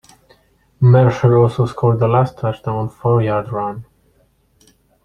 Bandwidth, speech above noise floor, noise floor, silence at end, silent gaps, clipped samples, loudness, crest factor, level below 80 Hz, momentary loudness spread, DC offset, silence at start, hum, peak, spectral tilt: 6.6 kHz; 43 dB; -57 dBFS; 1.2 s; none; under 0.1%; -16 LUFS; 16 dB; -46 dBFS; 12 LU; under 0.1%; 0.8 s; none; -2 dBFS; -9 dB/octave